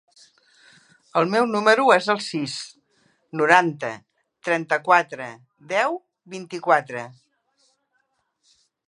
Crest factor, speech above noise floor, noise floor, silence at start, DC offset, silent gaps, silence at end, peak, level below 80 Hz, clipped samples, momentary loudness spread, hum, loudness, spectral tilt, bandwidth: 24 dB; 50 dB; -71 dBFS; 1.15 s; under 0.1%; none; 1.75 s; 0 dBFS; -76 dBFS; under 0.1%; 19 LU; none; -21 LUFS; -4.5 dB/octave; 11.5 kHz